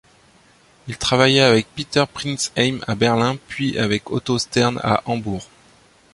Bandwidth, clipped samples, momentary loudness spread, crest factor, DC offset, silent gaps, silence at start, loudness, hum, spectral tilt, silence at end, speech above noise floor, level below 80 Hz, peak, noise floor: 11.5 kHz; under 0.1%; 10 LU; 18 dB; under 0.1%; none; 0.85 s; -19 LUFS; none; -4.5 dB/octave; 0.7 s; 34 dB; -50 dBFS; -2 dBFS; -53 dBFS